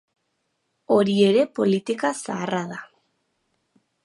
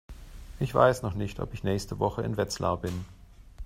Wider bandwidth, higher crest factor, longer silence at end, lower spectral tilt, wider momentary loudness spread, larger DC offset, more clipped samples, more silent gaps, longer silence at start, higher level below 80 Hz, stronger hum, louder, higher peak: second, 11.5 kHz vs 16 kHz; about the same, 18 dB vs 22 dB; first, 1.2 s vs 0 s; about the same, -5.5 dB/octave vs -6 dB/octave; second, 11 LU vs 24 LU; neither; neither; neither; first, 0.9 s vs 0.1 s; second, -74 dBFS vs -46 dBFS; neither; first, -22 LUFS vs -29 LUFS; about the same, -6 dBFS vs -6 dBFS